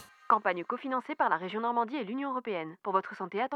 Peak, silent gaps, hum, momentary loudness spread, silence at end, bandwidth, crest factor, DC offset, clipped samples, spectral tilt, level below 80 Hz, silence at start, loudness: -10 dBFS; none; none; 7 LU; 0 s; 12 kHz; 22 dB; under 0.1%; under 0.1%; -6.5 dB/octave; under -90 dBFS; 0 s; -32 LUFS